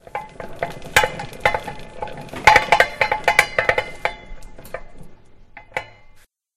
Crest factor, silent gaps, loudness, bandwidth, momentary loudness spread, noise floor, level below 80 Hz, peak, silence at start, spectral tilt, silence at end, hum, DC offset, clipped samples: 22 dB; none; -18 LUFS; 16 kHz; 23 LU; -48 dBFS; -42 dBFS; 0 dBFS; 0.15 s; -2.5 dB/octave; 0.35 s; none; under 0.1%; under 0.1%